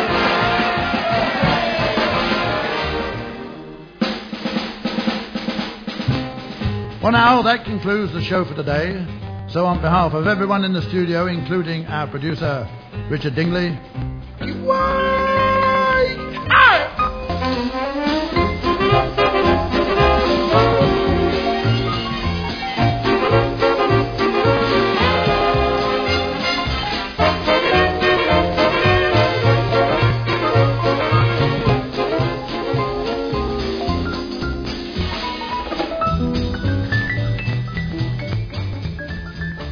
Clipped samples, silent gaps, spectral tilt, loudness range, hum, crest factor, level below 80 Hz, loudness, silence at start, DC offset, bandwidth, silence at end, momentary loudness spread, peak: under 0.1%; none; -7 dB/octave; 7 LU; none; 16 dB; -34 dBFS; -18 LUFS; 0 s; under 0.1%; 5.4 kHz; 0 s; 10 LU; -2 dBFS